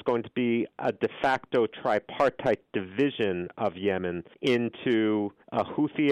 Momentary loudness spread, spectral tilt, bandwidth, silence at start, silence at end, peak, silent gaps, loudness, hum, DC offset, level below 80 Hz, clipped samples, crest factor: 5 LU; -7 dB/octave; 10.5 kHz; 0.05 s; 0 s; -14 dBFS; none; -28 LUFS; none; under 0.1%; -66 dBFS; under 0.1%; 14 dB